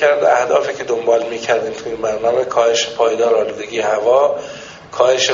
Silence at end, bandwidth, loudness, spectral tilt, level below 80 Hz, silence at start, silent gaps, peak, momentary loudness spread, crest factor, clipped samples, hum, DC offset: 0 s; 7.6 kHz; -16 LUFS; -1 dB/octave; -56 dBFS; 0 s; none; 0 dBFS; 9 LU; 16 dB; under 0.1%; none; under 0.1%